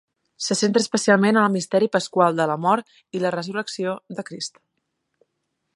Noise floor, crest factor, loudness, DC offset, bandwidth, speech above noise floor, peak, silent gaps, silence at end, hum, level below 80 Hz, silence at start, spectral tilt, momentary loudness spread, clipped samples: -76 dBFS; 20 dB; -21 LUFS; under 0.1%; 11.5 kHz; 55 dB; -2 dBFS; none; 1.25 s; none; -72 dBFS; 0.4 s; -4.5 dB/octave; 14 LU; under 0.1%